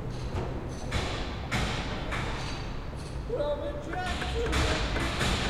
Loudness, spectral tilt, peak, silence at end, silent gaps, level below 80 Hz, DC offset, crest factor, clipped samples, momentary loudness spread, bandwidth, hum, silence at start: -32 LUFS; -4.5 dB/octave; -14 dBFS; 0 s; none; -36 dBFS; under 0.1%; 16 dB; under 0.1%; 9 LU; 14.5 kHz; none; 0 s